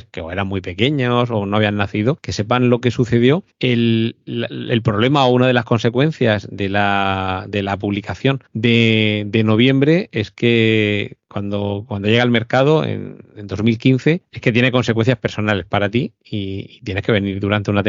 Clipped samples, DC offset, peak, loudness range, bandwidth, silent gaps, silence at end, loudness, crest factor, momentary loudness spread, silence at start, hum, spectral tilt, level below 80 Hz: under 0.1%; under 0.1%; -2 dBFS; 2 LU; 7.6 kHz; none; 0 s; -17 LUFS; 16 dB; 10 LU; 0.15 s; none; -5 dB/octave; -50 dBFS